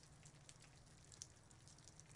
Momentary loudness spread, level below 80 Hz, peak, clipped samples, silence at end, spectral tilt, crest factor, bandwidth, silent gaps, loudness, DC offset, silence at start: 7 LU; -76 dBFS; -32 dBFS; under 0.1%; 0 s; -2.5 dB/octave; 32 dB; 12 kHz; none; -62 LUFS; under 0.1%; 0 s